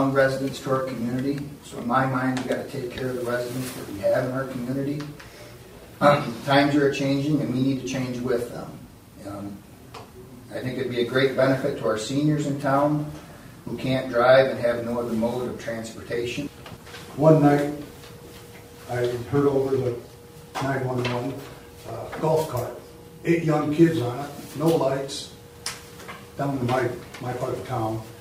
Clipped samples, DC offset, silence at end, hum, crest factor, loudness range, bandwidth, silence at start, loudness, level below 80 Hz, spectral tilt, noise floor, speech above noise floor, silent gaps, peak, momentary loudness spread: under 0.1%; under 0.1%; 0 s; none; 22 dB; 6 LU; 16 kHz; 0 s; -24 LUFS; -54 dBFS; -6.5 dB/octave; -44 dBFS; 20 dB; none; -2 dBFS; 22 LU